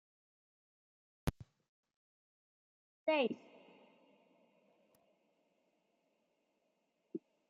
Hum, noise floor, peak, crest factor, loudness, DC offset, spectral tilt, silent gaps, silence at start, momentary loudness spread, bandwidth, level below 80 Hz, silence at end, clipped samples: none; -82 dBFS; -22 dBFS; 26 dB; -40 LUFS; under 0.1%; -4 dB/octave; 1.68-1.83 s, 1.96-3.06 s; 1.25 s; 16 LU; 7.4 kHz; -62 dBFS; 0.3 s; under 0.1%